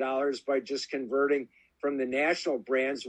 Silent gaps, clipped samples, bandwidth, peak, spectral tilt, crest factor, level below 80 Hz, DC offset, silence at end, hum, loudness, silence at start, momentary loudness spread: none; under 0.1%; 9.6 kHz; -14 dBFS; -3.5 dB/octave; 16 dB; -76 dBFS; under 0.1%; 0 s; none; -30 LUFS; 0 s; 6 LU